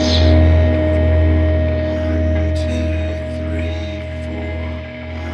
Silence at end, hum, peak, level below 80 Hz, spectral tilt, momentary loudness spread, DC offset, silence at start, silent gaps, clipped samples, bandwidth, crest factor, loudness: 0 s; none; 0 dBFS; -20 dBFS; -7 dB/octave; 13 LU; under 0.1%; 0 s; none; under 0.1%; 7 kHz; 16 dB; -17 LUFS